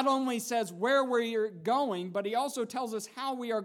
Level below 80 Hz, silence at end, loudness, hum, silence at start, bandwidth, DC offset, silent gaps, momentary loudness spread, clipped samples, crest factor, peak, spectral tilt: under -90 dBFS; 0 s; -31 LUFS; none; 0 s; 17.5 kHz; under 0.1%; none; 8 LU; under 0.1%; 16 dB; -16 dBFS; -4 dB/octave